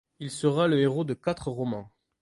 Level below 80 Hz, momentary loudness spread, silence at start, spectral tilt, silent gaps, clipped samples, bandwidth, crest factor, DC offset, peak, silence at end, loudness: -58 dBFS; 11 LU; 0.2 s; -6.5 dB/octave; none; under 0.1%; 11.5 kHz; 16 dB; under 0.1%; -12 dBFS; 0.35 s; -27 LUFS